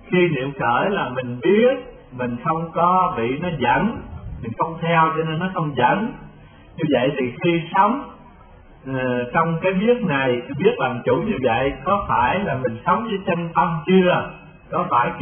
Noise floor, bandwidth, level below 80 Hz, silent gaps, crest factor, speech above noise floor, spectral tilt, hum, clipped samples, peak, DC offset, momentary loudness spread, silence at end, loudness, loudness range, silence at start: -45 dBFS; 3.5 kHz; -46 dBFS; none; 18 dB; 26 dB; -11.5 dB/octave; none; under 0.1%; -4 dBFS; under 0.1%; 10 LU; 0 s; -20 LUFS; 2 LU; 0 s